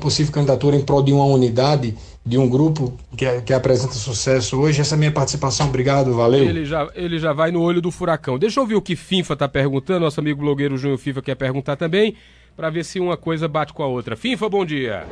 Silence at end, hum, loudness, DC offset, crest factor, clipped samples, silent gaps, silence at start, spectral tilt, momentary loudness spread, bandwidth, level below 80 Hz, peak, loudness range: 0 s; none; -19 LUFS; under 0.1%; 16 dB; under 0.1%; none; 0 s; -6 dB/octave; 8 LU; 10.5 kHz; -44 dBFS; -4 dBFS; 4 LU